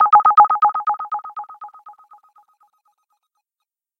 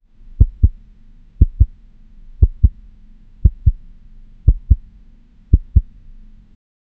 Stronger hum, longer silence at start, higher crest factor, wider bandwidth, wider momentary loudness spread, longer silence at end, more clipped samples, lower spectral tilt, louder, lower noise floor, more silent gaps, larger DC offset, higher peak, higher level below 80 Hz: neither; second, 0 s vs 0.4 s; about the same, 18 dB vs 18 dB; first, 4.9 kHz vs 0.9 kHz; first, 26 LU vs 4 LU; first, 2.1 s vs 1.2 s; neither; second, -4.5 dB/octave vs -13.5 dB/octave; first, -15 LUFS vs -18 LUFS; first, -83 dBFS vs -45 dBFS; neither; second, under 0.1% vs 0.2%; about the same, 0 dBFS vs 0 dBFS; second, -68 dBFS vs -20 dBFS